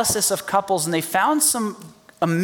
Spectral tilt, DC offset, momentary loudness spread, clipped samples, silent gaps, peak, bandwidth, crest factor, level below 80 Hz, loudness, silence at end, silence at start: -3 dB/octave; under 0.1%; 9 LU; under 0.1%; none; -6 dBFS; 19.5 kHz; 16 dB; -58 dBFS; -20 LUFS; 0 s; 0 s